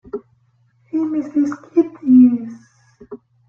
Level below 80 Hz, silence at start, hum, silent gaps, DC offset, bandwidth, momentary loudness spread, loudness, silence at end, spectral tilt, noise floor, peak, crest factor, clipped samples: -60 dBFS; 0.15 s; none; none; under 0.1%; 6.8 kHz; 21 LU; -16 LUFS; 0.35 s; -8.5 dB/octave; -59 dBFS; -2 dBFS; 16 dB; under 0.1%